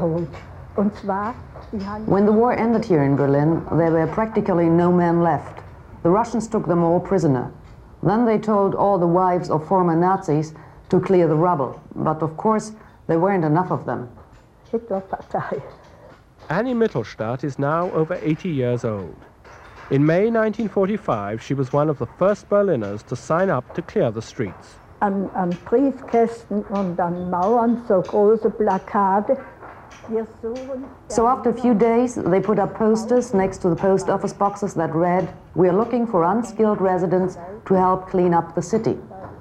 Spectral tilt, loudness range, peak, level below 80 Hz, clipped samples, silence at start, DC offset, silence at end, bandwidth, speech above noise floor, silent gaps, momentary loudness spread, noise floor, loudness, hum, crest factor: -8 dB/octave; 5 LU; -6 dBFS; -50 dBFS; under 0.1%; 0 s; under 0.1%; 0 s; 9.8 kHz; 28 dB; none; 12 LU; -48 dBFS; -20 LUFS; none; 14 dB